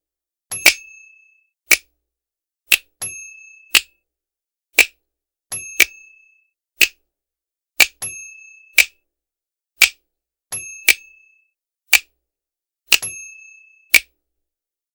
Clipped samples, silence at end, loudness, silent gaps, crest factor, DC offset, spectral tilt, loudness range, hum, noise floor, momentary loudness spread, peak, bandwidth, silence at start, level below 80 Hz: under 0.1%; 0.95 s; -16 LUFS; none; 22 dB; under 0.1%; 2 dB/octave; 1 LU; none; -88 dBFS; 15 LU; 0 dBFS; over 20 kHz; 0.5 s; -58 dBFS